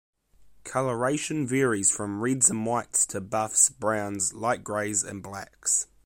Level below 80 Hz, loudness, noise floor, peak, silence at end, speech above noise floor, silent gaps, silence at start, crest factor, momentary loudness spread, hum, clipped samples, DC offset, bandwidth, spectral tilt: -62 dBFS; -25 LUFS; -56 dBFS; -6 dBFS; 0.2 s; 29 dB; none; 0.4 s; 22 dB; 10 LU; none; under 0.1%; under 0.1%; 16.5 kHz; -3.5 dB/octave